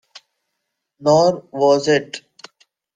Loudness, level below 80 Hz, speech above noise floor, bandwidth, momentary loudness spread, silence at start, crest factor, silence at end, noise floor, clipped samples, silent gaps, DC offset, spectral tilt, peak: -17 LUFS; -64 dBFS; 61 dB; 9.4 kHz; 15 LU; 1 s; 18 dB; 0.75 s; -77 dBFS; under 0.1%; none; under 0.1%; -5 dB/octave; -2 dBFS